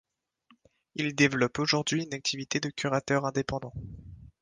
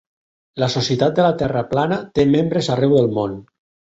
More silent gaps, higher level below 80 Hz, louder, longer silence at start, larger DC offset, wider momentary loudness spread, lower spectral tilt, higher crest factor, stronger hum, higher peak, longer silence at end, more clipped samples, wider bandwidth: neither; second, -56 dBFS vs -48 dBFS; second, -29 LUFS vs -18 LUFS; first, 0.95 s vs 0.55 s; neither; first, 17 LU vs 8 LU; second, -4 dB/octave vs -6.5 dB/octave; about the same, 20 dB vs 16 dB; neither; second, -10 dBFS vs -2 dBFS; second, 0.15 s vs 0.5 s; neither; first, 10 kHz vs 8 kHz